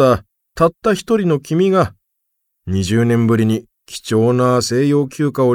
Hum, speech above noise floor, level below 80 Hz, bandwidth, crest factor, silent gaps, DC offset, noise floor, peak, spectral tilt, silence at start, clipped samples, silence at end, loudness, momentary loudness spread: none; 58 dB; -46 dBFS; 16.5 kHz; 14 dB; none; under 0.1%; -72 dBFS; -2 dBFS; -6.5 dB/octave; 0 s; under 0.1%; 0 s; -16 LUFS; 8 LU